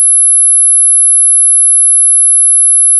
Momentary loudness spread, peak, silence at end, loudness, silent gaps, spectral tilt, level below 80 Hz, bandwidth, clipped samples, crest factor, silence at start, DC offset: 0 LU; -4 dBFS; 0 s; -3 LUFS; none; 10 dB/octave; under -90 dBFS; 12 kHz; under 0.1%; 4 dB; 0 s; under 0.1%